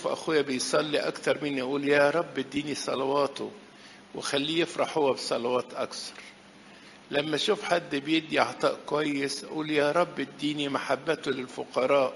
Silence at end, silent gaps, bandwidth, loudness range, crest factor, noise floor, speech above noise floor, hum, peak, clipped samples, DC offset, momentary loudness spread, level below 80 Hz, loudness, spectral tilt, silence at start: 0 s; none; 11.5 kHz; 3 LU; 22 dB; -51 dBFS; 23 dB; none; -6 dBFS; under 0.1%; under 0.1%; 9 LU; -70 dBFS; -28 LUFS; -4 dB/octave; 0 s